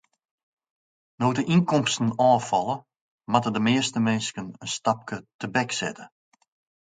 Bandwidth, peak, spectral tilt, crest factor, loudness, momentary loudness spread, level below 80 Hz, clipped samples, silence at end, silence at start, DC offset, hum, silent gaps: 9.6 kHz; -4 dBFS; -5 dB/octave; 22 dB; -25 LUFS; 12 LU; -66 dBFS; under 0.1%; 0.75 s; 1.2 s; under 0.1%; none; 3.01-3.18 s, 5.34-5.39 s